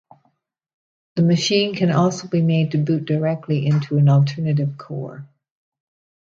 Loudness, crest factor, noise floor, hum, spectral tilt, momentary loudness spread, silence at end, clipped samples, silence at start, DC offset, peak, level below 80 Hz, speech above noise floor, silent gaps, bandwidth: -19 LUFS; 16 dB; -67 dBFS; none; -6.5 dB/octave; 13 LU; 0.95 s; under 0.1%; 1.15 s; under 0.1%; -4 dBFS; -62 dBFS; 49 dB; none; 7.6 kHz